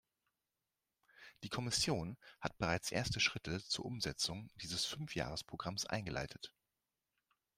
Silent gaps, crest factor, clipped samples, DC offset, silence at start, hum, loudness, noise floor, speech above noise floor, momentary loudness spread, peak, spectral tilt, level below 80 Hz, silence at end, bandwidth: none; 24 dB; under 0.1%; under 0.1%; 1.2 s; none; -40 LUFS; under -90 dBFS; over 49 dB; 12 LU; -20 dBFS; -3 dB/octave; -62 dBFS; 1.1 s; 16 kHz